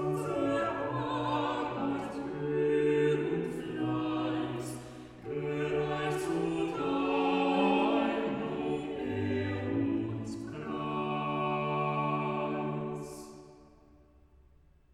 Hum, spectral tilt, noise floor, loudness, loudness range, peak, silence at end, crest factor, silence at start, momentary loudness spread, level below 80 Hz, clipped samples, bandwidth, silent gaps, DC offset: none; -6.5 dB/octave; -62 dBFS; -32 LUFS; 4 LU; -16 dBFS; 1.3 s; 16 dB; 0 s; 11 LU; -60 dBFS; under 0.1%; 14 kHz; none; under 0.1%